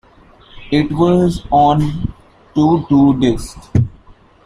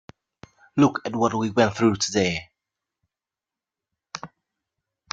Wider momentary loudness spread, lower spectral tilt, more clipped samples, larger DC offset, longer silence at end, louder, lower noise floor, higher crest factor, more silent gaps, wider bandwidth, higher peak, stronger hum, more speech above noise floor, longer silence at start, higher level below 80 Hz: second, 12 LU vs 17 LU; first, -8 dB/octave vs -5 dB/octave; neither; neither; second, 0.35 s vs 0.85 s; first, -15 LUFS vs -22 LUFS; second, -45 dBFS vs -90 dBFS; second, 14 dB vs 22 dB; neither; first, 11.5 kHz vs 9.2 kHz; about the same, -2 dBFS vs -4 dBFS; neither; second, 32 dB vs 68 dB; second, 0.55 s vs 0.75 s; first, -34 dBFS vs -60 dBFS